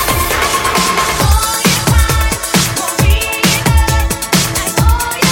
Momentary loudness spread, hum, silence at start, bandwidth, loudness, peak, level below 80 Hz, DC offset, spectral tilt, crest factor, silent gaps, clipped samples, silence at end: 2 LU; none; 0 s; 17 kHz; -12 LUFS; 0 dBFS; -18 dBFS; under 0.1%; -3.5 dB/octave; 12 dB; none; under 0.1%; 0 s